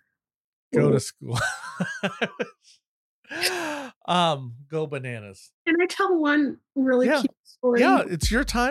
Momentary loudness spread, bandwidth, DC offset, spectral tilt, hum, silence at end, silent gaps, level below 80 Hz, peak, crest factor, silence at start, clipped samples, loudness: 12 LU; 15 kHz; under 0.1%; -5 dB/octave; none; 0 s; 2.86-3.23 s, 3.96-4.01 s, 5.53-5.65 s, 7.39-7.44 s; -44 dBFS; -8 dBFS; 18 dB; 0.7 s; under 0.1%; -24 LUFS